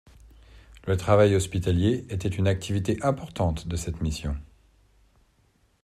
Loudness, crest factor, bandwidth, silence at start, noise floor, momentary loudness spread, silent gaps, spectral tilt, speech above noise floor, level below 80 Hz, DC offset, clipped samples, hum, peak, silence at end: -26 LUFS; 20 dB; 13.5 kHz; 0.55 s; -65 dBFS; 12 LU; none; -6.5 dB/octave; 40 dB; -42 dBFS; under 0.1%; under 0.1%; none; -6 dBFS; 1.35 s